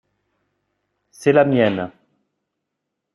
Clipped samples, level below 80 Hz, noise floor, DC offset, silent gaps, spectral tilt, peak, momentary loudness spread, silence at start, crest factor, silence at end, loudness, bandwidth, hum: under 0.1%; -64 dBFS; -79 dBFS; under 0.1%; none; -7 dB/octave; -2 dBFS; 13 LU; 1.2 s; 20 dB; 1.25 s; -17 LUFS; 12 kHz; none